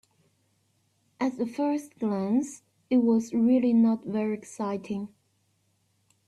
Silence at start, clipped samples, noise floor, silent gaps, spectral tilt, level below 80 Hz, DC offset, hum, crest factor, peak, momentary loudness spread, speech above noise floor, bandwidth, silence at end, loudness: 1.2 s; under 0.1%; -71 dBFS; none; -7 dB/octave; -72 dBFS; under 0.1%; none; 14 dB; -14 dBFS; 11 LU; 45 dB; 11.5 kHz; 1.2 s; -27 LUFS